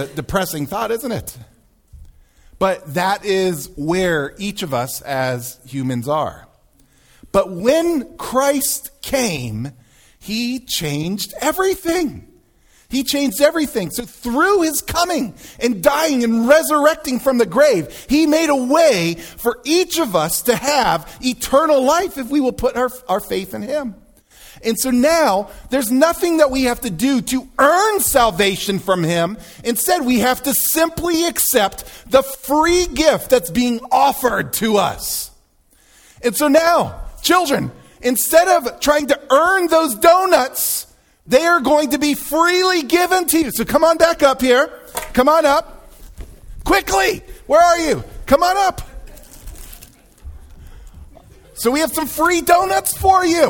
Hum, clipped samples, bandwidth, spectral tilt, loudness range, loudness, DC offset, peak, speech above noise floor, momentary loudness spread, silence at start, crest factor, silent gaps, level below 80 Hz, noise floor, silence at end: none; under 0.1%; over 20 kHz; -3.5 dB/octave; 7 LU; -16 LUFS; under 0.1%; 0 dBFS; 38 dB; 10 LU; 0 s; 18 dB; none; -40 dBFS; -55 dBFS; 0 s